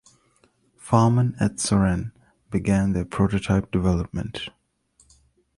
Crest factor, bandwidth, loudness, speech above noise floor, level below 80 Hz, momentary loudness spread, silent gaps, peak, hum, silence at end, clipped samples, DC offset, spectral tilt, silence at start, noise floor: 20 dB; 11.5 kHz; -23 LUFS; 41 dB; -40 dBFS; 11 LU; none; -4 dBFS; none; 1.1 s; under 0.1%; under 0.1%; -6.5 dB/octave; 0.85 s; -63 dBFS